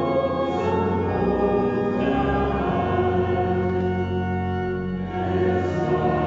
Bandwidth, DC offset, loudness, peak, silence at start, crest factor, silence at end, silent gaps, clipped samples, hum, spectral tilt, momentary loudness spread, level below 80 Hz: 7.4 kHz; under 0.1%; -23 LUFS; -10 dBFS; 0 s; 12 dB; 0 s; none; under 0.1%; none; -7 dB/octave; 4 LU; -40 dBFS